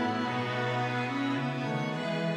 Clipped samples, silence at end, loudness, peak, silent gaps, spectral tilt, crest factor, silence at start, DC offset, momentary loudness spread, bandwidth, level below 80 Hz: under 0.1%; 0 s; -31 LUFS; -18 dBFS; none; -6.5 dB/octave; 12 dB; 0 s; under 0.1%; 2 LU; 11.5 kHz; -78 dBFS